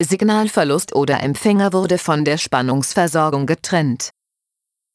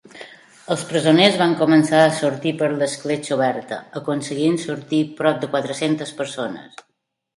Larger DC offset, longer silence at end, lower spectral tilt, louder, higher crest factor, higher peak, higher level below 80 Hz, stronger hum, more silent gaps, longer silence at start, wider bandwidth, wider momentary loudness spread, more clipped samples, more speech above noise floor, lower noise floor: neither; first, 0.85 s vs 0.7 s; about the same, -5 dB/octave vs -5 dB/octave; about the same, -17 LUFS vs -19 LUFS; about the same, 16 dB vs 20 dB; about the same, -2 dBFS vs 0 dBFS; first, -58 dBFS vs -66 dBFS; neither; neither; second, 0 s vs 0.15 s; about the same, 11 kHz vs 11.5 kHz; second, 3 LU vs 14 LU; neither; first, 64 dB vs 23 dB; first, -81 dBFS vs -42 dBFS